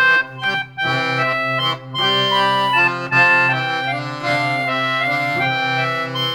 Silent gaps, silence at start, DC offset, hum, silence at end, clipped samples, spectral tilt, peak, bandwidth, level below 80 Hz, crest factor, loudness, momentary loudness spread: none; 0 s; under 0.1%; none; 0 s; under 0.1%; -4.5 dB/octave; -2 dBFS; 19 kHz; -62 dBFS; 16 dB; -17 LUFS; 7 LU